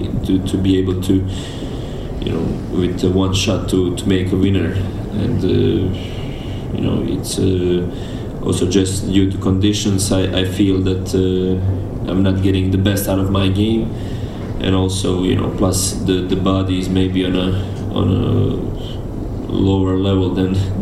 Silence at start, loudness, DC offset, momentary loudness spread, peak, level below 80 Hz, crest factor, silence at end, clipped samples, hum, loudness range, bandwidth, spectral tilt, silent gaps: 0 s; -18 LUFS; under 0.1%; 9 LU; 0 dBFS; -30 dBFS; 16 dB; 0 s; under 0.1%; none; 2 LU; 13 kHz; -6 dB/octave; none